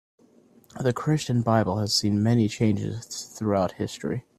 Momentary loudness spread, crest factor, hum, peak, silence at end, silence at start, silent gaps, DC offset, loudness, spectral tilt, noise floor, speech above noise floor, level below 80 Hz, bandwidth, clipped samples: 9 LU; 18 dB; none; -6 dBFS; 0.2 s; 0.75 s; none; under 0.1%; -25 LUFS; -5.5 dB/octave; -57 dBFS; 33 dB; -58 dBFS; 14.5 kHz; under 0.1%